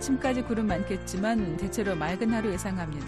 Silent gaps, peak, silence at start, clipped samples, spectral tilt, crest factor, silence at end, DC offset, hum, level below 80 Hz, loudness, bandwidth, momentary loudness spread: none; -16 dBFS; 0 s; under 0.1%; -5.5 dB/octave; 12 dB; 0 s; under 0.1%; none; -44 dBFS; -29 LUFS; 13 kHz; 4 LU